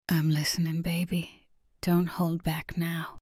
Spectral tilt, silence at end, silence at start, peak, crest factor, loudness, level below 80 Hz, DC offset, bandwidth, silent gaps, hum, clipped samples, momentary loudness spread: -5.5 dB/octave; 0 s; 0.1 s; -14 dBFS; 16 dB; -29 LUFS; -52 dBFS; under 0.1%; 16 kHz; none; none; under 0.1%; 7 LU